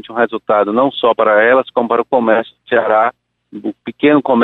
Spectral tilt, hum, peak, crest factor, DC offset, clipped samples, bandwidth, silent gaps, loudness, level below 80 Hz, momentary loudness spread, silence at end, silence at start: -7.5 dB/octave; none; 0 dBFS; 12 dB; under 0.1%; under 0.1%; 4.1 kHz; none; -13 LUFS; -62 dBFS; 9 LU; 0 s; 0.1 s